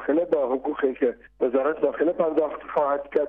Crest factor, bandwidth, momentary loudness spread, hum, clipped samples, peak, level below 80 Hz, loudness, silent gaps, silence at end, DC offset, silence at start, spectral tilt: 14 dB; 4.2 kHz; 4 LU; none; under 0.1%; -10 dBFS; -60 dBFS; -24 LUFS; none; 0 s; under 0.1%; 0 s; -8.5 dB/octave